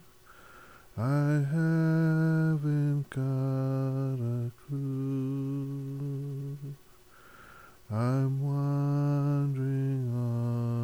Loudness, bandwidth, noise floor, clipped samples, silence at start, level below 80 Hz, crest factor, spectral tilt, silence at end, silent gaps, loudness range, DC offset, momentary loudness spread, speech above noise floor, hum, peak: -30 LUFS; 12.5 kHz; -57 dBFS; under 0.1%; 0.3 s; -64 dBFS; 12 dB; -9 dB/octave; 0 s; none; 7 LU; under 0.1%; 10 LU; 31 dB; none; -18 dBFS